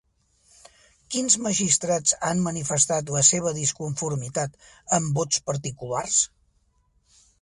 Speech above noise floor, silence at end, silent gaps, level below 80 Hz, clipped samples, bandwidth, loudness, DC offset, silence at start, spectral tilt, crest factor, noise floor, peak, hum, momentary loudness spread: 42 dB; 1.15 s; none; -58 dBFS; under 0.1%; 11.5 kHz; -23 LUFS; under 0.1%; 1.1 s; -3 dB/octave; 22 dB; -66 dBFS; -4 dBFS; none; 12 LU